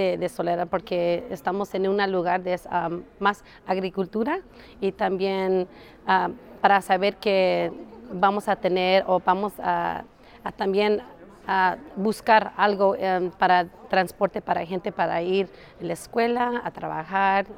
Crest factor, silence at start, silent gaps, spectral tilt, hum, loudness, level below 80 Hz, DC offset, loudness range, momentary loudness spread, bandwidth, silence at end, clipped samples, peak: 22 dB; 0 s; none; -5.5 dB/octave; none; -24 LUFS; -58 dBFS; under 0.1%; 4 LU; 10 LU; 16.5 kHz; 0 s; under 0.1%; -2 dBFS